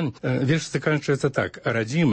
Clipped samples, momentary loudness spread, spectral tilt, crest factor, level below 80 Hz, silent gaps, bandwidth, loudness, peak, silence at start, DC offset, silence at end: under 0.1%; 3 LU; -6 dB/octave; 16 dB; -58 dBFS; none; 8.8 kHz; -24 LUFS; -6 dBFS; 0 s; under 0.1%; 0 s